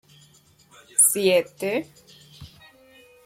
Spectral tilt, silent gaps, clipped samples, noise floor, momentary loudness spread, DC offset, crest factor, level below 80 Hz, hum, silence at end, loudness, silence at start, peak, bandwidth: -2 dB/octave; none; under 0.1%; -56 dBFS; 13 LU; under 0.1%; 22 dB; -64 dBFS; none; 0.8 s; -20 LUFS; 1 s; -6 dBFS; 16.5 kHz